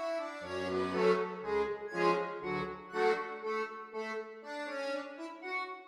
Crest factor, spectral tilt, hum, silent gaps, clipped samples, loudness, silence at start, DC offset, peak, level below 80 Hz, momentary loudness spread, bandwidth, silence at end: 20 dB; -5.5 dB/octave; none; none; under 0.1%; -35 LUFS; 0 s; under 0.1%; -16 dBFS; -68 dBFS; 10 LU; 11 kHz; 0 s